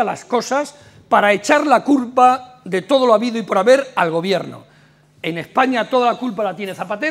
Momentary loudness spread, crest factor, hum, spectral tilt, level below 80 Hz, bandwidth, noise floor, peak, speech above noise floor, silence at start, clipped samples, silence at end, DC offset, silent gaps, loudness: 11 LU; 16 dB; none; -4.5 dB/octave; -66 dBFS; 15.5 kHz; -51 dBFS; 0 dBFS; 34 dB; 0 s; under 0.1%; 0 s; under 0.1%; none; -17 LUFS